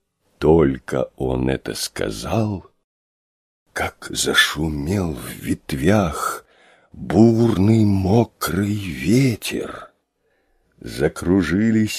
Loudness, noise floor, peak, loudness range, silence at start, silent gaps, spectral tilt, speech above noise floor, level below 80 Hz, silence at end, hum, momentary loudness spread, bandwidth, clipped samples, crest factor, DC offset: -19 LUFS; -67 dBFS; 0 dBFS; 5 LU; 0.4 s; 2.84-3.66 s; -5.5 dB/octave; 48 dB; -38 dBFS; 0 s; none; 12 LU; 15.5 kHz; under 0.1%; 20 dB; under 0.1%